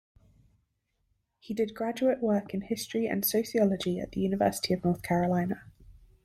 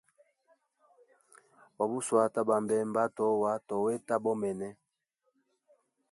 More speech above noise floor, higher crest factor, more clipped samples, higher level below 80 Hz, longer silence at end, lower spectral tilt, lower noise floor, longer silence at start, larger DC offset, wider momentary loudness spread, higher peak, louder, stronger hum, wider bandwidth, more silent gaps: about the same, 48 dB vs 50 dB; about the same, 18 dB vs 20 dB; neither; first, -58 dBFS vs -78 dBFS; second, 0.35 s vs 1.4 s; about the same, -5.5 dB/octave vs -6 dB/octave; about the same, -77 dBFS vs -80 dBFS; second, 1.45 s vs 1.8 s; neither; about the same, 6 LU vs 7 LU; about the same, -12 dBFS vs -12 dBFS; about the same, -29 LUFS vs -31 LUFS; neither; first, 16 kHz vs 11.5 kHz; neither